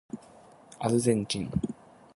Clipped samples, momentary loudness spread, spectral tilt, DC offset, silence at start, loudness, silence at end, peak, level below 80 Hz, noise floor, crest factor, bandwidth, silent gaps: under 0.1%; 19 LU; -5.5 dB/octave; under 0.1%; 0.15 s; -29 LUFS; 0.45 s; -10 dBFS; -54 dBFS; -54 dBFS; 20 dB; 11.5 kHz; none